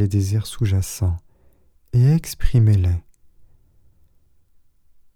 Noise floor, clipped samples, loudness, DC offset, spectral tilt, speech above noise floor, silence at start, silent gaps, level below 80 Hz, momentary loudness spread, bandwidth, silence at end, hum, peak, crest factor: -55 dBFS; under 0.1%; -20 LUFS; under 0.1%; -7 dB/octave; 38 dB; 0 s; none; -32 dBFS; 8 LU; 17 kHz; 2.15 s; none; -4 dBFS; 18 dB